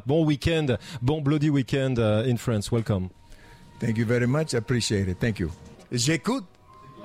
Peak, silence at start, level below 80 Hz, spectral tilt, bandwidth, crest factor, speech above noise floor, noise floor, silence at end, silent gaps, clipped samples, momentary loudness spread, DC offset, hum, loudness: -12 dBFS; 0.05 s; -46 dBFS; -6 dB/octave; 15.5 kHz; 12 dB; 24 dB; -48 dBFS; 0 s; none; under 0.1%; 9 LU; under 0.1%; none; -25 LUFS